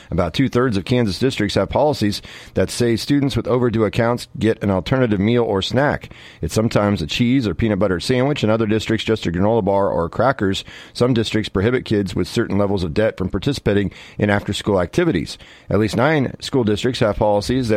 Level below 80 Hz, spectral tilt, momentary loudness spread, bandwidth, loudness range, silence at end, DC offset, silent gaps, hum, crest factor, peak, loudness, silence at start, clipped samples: -40 dBFS; -6 dB/octave; 5 LU; 15.5 kHz; 2 LU; 0 s; under 0.1%; none; none; 16 dB; -2 dBFS; -19 LUFS; 0.1 s; under 0.1%